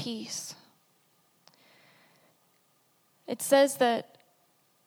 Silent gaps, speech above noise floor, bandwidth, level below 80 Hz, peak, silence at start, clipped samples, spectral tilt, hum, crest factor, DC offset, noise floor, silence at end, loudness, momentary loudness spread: none; 42 dB; 18 kHz; -88 dBFS; -10 dBFS; 0 s; under 0.1%; -2.5 dB/octave; none; 24 dB; under 0.1%; -69 dBFS; 0.85 s; -27 LUFS; 27 LU